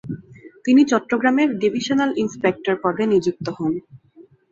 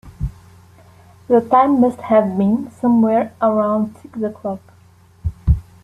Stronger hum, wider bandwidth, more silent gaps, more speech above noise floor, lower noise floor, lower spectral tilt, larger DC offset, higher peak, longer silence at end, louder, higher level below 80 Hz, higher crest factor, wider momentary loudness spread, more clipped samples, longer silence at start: neither; second, 7.8 kHz vs 10.5 kHz; neither; about the same, 31 dB vs 33 dB; about the same, -50 dBFS vs -49 dBFS; second, -5.5 dB/octave vs -9.5 dB/octave; neither; about the same, -4 dBFS vs -2 dBFS; about the same, 0.3 s vs 0.25 s; second, -20 LUFS vs -17 LUFS; second, -60 dBFS vs -32 dBFS; about the same, 16 dB vs 16 dB; second, 11 LU vs 15 LU; neither; about the same, 0.05 s vs 0.05 s